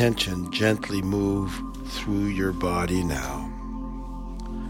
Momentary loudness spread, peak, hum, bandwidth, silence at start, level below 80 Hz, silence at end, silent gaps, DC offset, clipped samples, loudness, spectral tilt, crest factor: 12 LU; -6 dBFS; none; 17 kHz; 0 s; -36 dBFS; 0 s; none; under 0.1%; under 0.1%; -27 LUFS; -5.5 dB/octave; 20 dB